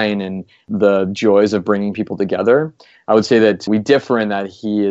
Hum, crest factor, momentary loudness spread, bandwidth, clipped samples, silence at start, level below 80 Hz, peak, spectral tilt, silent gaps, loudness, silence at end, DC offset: none; 16 dB; 11 LU; 8 kHz; under 0.1%; 0 s; -60 dBFS; 0 dBFS; -6.5 dB/octave; none; -16 LUFS; 0 s; under 0.1%